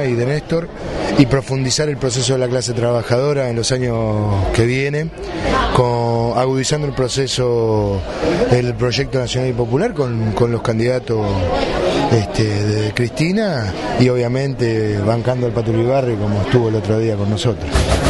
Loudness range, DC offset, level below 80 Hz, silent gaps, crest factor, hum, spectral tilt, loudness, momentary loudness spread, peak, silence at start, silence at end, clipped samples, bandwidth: 1 LU; under 0.1%; -32 dBFS; none; 16 dB; none; -5.5 dB/octave; -17 LUFS; 4 LU; 0 dBFS; 0 s; 0 s; under 0.1%; 11.5 kHz